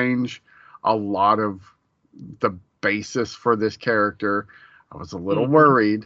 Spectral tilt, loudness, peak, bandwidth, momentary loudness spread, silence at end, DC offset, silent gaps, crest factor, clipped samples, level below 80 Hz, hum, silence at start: -5 dB/octave; -21 LUFS; -2 dBFS; 7.8 kHz; 15 LU; 0 s; under 0.1%; none; 20 dB; under 0.1%; -64 dBFS; none; 0 s